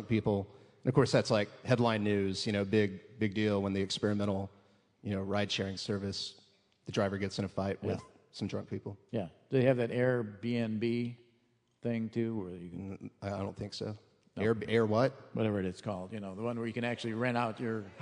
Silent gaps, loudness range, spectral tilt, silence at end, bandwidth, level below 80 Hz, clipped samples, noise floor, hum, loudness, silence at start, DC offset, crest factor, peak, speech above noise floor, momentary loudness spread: none; 6 LU; -6.5 dB/octave; 0 s; 10.5 kHz; -70 dBFS; under 0.1%; -73 dBFS; none; -34 LUFS; 0 s; under 0.1%; 22 dB; -12 dBFS; 40 dB; 13 LU